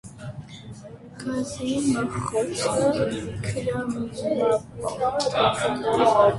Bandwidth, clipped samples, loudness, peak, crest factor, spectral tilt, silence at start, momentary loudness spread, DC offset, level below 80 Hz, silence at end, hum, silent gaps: 11.5 kHz; under 0.1%; -24 LUFS; -6 dBFS; 18 dB; -5 dB/octave; 0.05 s; 17 LU; under 0.1%; -50 dBFS; 0 s; none; none